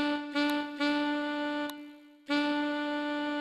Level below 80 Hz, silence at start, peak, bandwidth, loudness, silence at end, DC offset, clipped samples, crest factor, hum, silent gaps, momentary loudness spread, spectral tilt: -76 dBFS; 0 s; -18 dBFS; 13.5 kHz; -31 LUFS; 0 s; under 0.1%; under 0.1%; 14 dB; none; none; 10 LU; -3.5 dB/octave